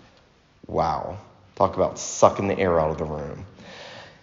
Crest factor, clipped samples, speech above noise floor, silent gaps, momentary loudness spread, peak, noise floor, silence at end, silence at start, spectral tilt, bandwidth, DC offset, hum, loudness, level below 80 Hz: 24 dB; under 0.1%; 34 dB; none; 21 LU; -2 dBFS; -57 dBFS; 0.15 s; 0.7 s; -5.5 dB/octave; 7.4 kHz; under 0.1%; none; -23 LUFS; -48 dBFS